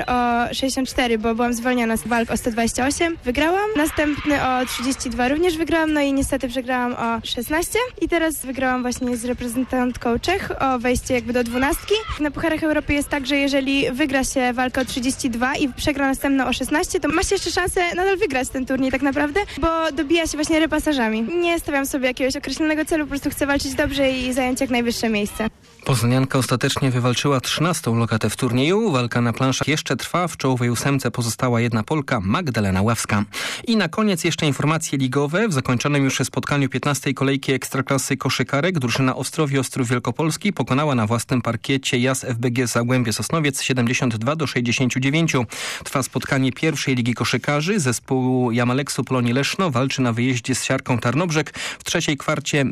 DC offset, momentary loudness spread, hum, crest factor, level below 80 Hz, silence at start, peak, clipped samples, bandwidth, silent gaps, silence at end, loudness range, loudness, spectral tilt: under 0.1%; 3 LU; none; 12 dB; -42 dBFS; 0 s; -10 dBFS; under 0.1%; 15.5 kHz; none; 0 s; 1 LU; -21 LUFS; -4.5 dB/octave